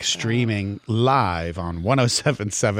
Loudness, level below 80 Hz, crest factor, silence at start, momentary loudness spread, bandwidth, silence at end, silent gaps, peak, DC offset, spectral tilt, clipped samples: -21 LUFS; -46 dBFS; 16 dB; 0 s; 8 LU; 15.5 kHz; 0 s; none; -6 dBFS; under 0.1%; -4.5 dB/octave; under 0.1%